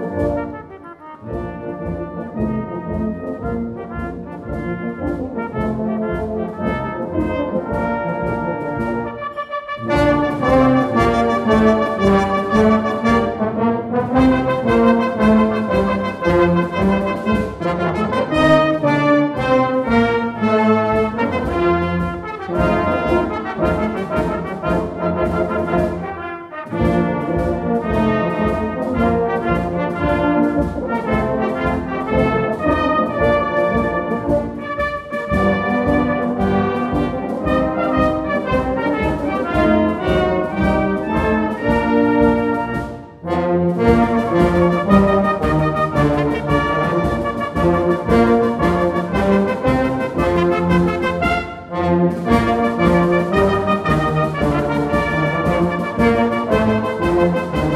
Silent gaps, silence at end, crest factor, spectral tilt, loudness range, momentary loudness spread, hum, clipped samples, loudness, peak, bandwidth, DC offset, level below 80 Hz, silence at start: none; 0 s; 16 dB; -7.5 dB/octave; 6 LU; 9 LU; none; under 0.1%; -18 LUFS; 0 dBFS; 13 kHz; under 0.1%; -34 dBFS; 0 s